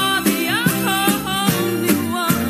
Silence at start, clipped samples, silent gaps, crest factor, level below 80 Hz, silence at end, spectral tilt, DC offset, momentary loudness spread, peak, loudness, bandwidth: 0 s; under 0.1%; none; 16 dB; -48 dBFS; 0 s; -3.5 dB/octave; under 0.1%; 2 LU; -2 dBFS; -18 LUFS; 15.5 kHz